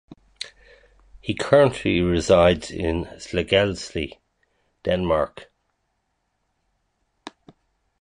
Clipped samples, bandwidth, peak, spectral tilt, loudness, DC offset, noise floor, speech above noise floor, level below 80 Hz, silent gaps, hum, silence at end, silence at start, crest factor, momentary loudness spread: under 0.1%; 11 kHz; -2 dBFS; -5.5 dB/octave; -21 LUFS; under 0.1%; -73 dBFS; 53 dB; -42 dBFS; none; none; 0.75 s; 0.4 s; 22 dB; 20 LU